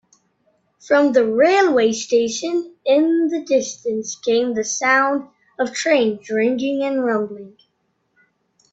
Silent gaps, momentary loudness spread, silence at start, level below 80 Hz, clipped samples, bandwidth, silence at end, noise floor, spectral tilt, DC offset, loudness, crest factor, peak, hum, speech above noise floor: none; 10 LU; 0.85 s; -66 dBFS; under 0.1%; 8.2 kHz; 1.25 s; -69 dBFS; -3 dB/octave; under 0.1%; -18 LUFS; 16 dB; -2 dBFS; none; 51 dB